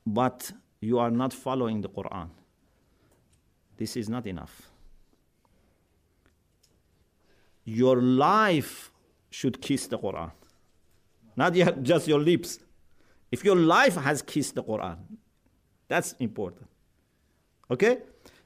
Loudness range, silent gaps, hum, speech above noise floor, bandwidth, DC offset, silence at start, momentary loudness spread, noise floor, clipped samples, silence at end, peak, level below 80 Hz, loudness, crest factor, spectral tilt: 15 LU; none; none; 43 dB; 15.5 kHz; under 0.1%; 0.05 s; 20 LU; -69 dBFS; under 0.1%; 0.45 s; -8 dBFS; -62 dBFS; -26 LUFS; 20 dB; -5.5 dB/octave